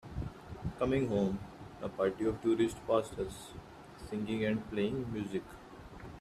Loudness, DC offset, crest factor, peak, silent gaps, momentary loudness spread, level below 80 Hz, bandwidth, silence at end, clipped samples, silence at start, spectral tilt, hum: -35 LUFS; under 0.1%; 20 dB; -16 dBFS; none; 19 LU; -54 dBFS; 14 kHz; 0 s; under 0.1%; 0.05 s; -7 dB/octave; none